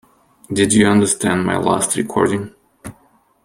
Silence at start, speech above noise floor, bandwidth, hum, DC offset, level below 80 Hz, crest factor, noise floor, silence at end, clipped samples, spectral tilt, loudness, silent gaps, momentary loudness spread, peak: 0.5 s; 40 dB; 16 kHz; none; under 0.1%; -50 dBFS; 16 dB; -55 dBFS; 0.55 s; under 0.1%; -4.5 dB/octave; -16 LUFS; none; 24 LU; -2 dBFS